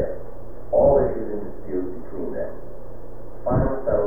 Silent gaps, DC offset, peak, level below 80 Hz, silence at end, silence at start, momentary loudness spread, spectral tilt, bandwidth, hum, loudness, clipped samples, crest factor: none; 5%; -6 dBFS; -36 dBFS; 0 s; 0 s; 23 LU; -11.5 dB/octave; 2.3 kHz; none; -24 LUFS; under 0.1%; 18 dB